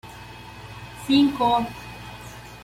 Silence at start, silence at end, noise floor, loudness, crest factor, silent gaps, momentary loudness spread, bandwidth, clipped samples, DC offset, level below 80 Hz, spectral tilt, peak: 0.05 s; 0 s; -41 dBFS; -21 LUFS; 18 dB; none; 21 LU; 16 kHz; under 0.1%; under 0.1%; -50 dBFS; -5.5 dB/octave; -8 dBFS